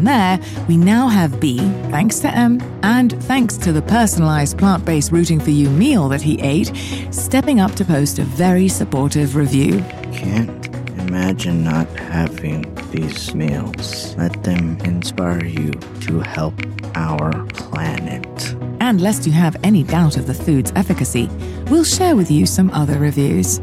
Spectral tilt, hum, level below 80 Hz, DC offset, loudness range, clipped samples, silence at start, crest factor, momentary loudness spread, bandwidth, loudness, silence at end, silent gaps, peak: -5.5 dB/octave; none; -36 dBFS; under 0.1%; 6 LU; under 0.1%; 0 s; 12 dB; 10 LU; 15.5 kHz; -17 LUFS; 0 s; none; -4 dBFS